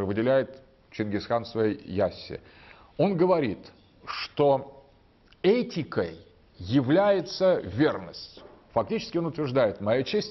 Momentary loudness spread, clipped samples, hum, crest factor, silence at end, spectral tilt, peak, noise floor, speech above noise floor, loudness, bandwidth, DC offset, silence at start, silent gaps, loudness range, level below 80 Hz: 17 LU; under 0.1%; none; 16 dB; 0 s; -7.5 dB/octave; -12 dBFS; -59 dBFS; 33 dB; -26 LUFS; 6.2 kHz; under 0.1%; 0 s; none; 3 LU; -60 dBFS